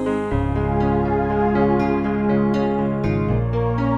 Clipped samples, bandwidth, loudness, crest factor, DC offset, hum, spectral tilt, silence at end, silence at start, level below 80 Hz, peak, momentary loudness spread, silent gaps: under 0.1%; 8.4 kHz; -20 LUFS; 12 dB; under 0.1%; none; -9.5 dB/octave; 0 s; 0 s; -32 dBFS; -6 dBFS; 3 LU; none